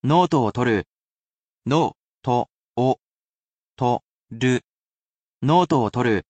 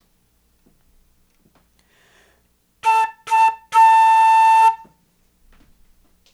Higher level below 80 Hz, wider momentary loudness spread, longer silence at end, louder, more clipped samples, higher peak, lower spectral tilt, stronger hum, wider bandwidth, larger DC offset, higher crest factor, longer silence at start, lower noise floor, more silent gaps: about the same, -58 dBFS vs -60 dBFS; first, 12 LU vs 8 LU; second, 0.1 s vs 1.55 s; second, -22 LUFS vs -14 LUFS; neither; about the same, -6 dBFS vs -6 dBFS; first, -7 dB/octave vs 1 dB/octave; neither; second, 8.8 kHz vs 12.5 kHz; neither; about the same, 16 dB vs 12 dB; second, 0.05 s vs 2.85 s; first, under -90 dBFS vs -62 dBFS; first, 0.90-1.30 s, 1.36-1.58 s, 1.95-2.20 s, 2.52-2.75 s, 3.02-3.76 s, 4.03-4.20 s, 4.69-5.41 s vs none